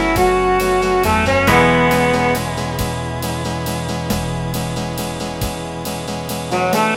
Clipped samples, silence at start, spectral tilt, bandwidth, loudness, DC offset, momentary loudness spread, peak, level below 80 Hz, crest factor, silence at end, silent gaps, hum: under 0.1%; 0 s; -5 dB/octave; 17 kHz; -17 LUFS; under 0.1%; 11 LU; 0 dBFS; -32 dBFS; 18 dB; 0 s; none; none